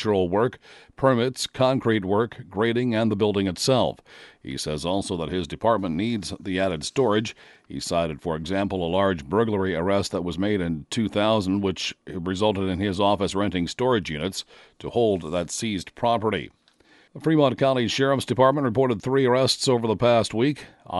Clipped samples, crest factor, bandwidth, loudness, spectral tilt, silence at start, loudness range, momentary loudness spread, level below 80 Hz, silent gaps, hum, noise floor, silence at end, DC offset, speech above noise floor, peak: under 0.1%; 20 dB; 11.5 kHz; -24 LUFS; -5.5 dB/octave; 0 s; 4 LU; 9 LU; -52 dBFS; none; none; -57 dBFS; 0 s; under 0.1%; 34 dB; -4 dBFS